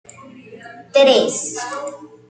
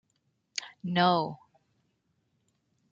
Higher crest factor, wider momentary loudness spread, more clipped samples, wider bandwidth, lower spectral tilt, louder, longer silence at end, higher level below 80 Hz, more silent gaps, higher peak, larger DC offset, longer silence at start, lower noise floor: second, 18 dB vs 24 dB; first, 23 LU vs 14 LU; neither; first, 9.4 kHz vs 7.8 kHz; second, -2 dB/octave vs -5 dB/octave; first, -16 LUFS vs -29 LUFS; second, 0.25 s vs 1.55 s; about the same, -70 dBFS vs -74 dBFS; neither; first, -2 dBFS vs -10 dBFS; neither; second, 0.2 s vs 0.55 s; second, -40 dBFS vs -76 dBFS